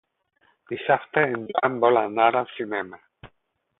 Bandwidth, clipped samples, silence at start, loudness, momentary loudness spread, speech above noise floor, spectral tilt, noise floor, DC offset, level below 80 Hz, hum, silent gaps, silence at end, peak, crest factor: 4 kHz; under 0.1%; 0.7 s; -23 LUFS; 11 LU; 49 dB; -9.5 dB/octave; -72 dBFS; under 0.1%; -66 dBFS; none; none; 0.55 s; -4 dBFS; 20 dB